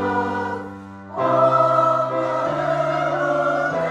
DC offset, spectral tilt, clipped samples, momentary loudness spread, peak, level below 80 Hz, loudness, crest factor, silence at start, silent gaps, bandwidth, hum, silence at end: under 0.1%; -6.5 dB/octave; under 0.1%; 14 LU; -4 dBFS; -60 dBFS; -20 LUFS; 16 dB; 0 s; none; 9.6 kHz; none; 0 s